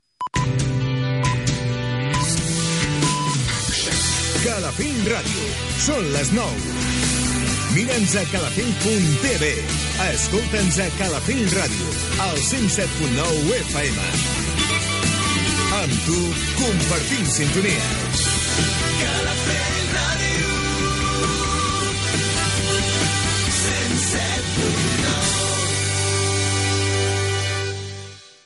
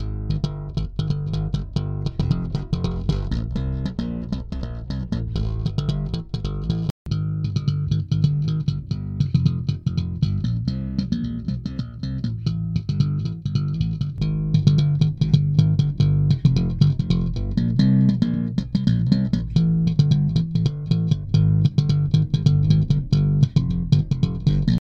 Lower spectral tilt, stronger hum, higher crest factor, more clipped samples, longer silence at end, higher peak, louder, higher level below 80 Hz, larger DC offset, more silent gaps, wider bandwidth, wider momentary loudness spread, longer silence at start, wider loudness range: second, -3.5 dB/octave vs -8.5 dB/octave; neither; about the same, 14 dB vs 18 dB; neither; about the same, 0.15 s vs 0.05 s; about the same, -6 dBFS vs -4 dBFS; about the same, -20 LUFS vs -22 LUFS; about the same, -34 dBFS vs -34 dBFS; neither; second, none vs 6.91-7.05 s; first, 11.5 kHz vs 6.8 kHz; second, 3 LU vs 9 LU; first, 0.2 s vs 0 s; second, 1 LU vs 7 LU